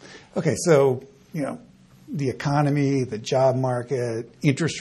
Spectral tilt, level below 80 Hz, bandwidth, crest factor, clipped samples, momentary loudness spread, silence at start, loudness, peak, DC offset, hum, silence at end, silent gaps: -6 dB/octave; -58 dBFS; 12.5 kHz; 18 dB; under 0.1%; 13 LU; 0.05 s; -23 LUFS; -6 dBFS; under 0.1%; none; 0 s; none